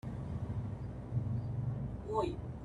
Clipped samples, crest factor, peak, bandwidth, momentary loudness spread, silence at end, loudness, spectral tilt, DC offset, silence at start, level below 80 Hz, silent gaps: under 0.1%; 18 dB; -22 dBFS; 10.5 kHz; 5 LU; 0 s; -39 LUFS; -9 dB/octave; under 0.1%; 0.05 s; -50 dBFS; none